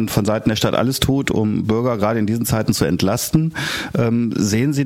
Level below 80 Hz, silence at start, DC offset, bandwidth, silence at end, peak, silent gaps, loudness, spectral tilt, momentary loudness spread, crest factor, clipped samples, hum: -40 dBFS; 0 s; under 0.1%; 16.5 kHz; 0 s; -2 dBFS; none; -18 LUFS; -5.5 dB/octave; 2 LU; 16 dB; under 0.1%; none